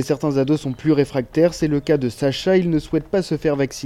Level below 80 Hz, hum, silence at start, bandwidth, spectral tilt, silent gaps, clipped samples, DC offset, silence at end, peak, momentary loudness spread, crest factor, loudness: -44 dBFS; none; 0 s; 13.5 kHz; -6.5 dB/octave; none; under 0.1%; under 0.1%; 0 s; -4 dBFS; 4 LU; 14 dB; -20 LUFS